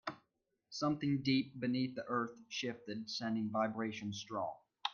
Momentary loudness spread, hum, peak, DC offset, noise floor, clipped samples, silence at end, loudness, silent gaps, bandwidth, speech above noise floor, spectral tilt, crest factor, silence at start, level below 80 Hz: 8 LU; none; -20 dBFS; under 0.1%; -83 dBFS; under 0.1%; 0 s; -39 LUFS; none; 7.2 kHz; 45 dB; -5.5 dB/octave; 18 dB; 0.05 s; -78 dBFS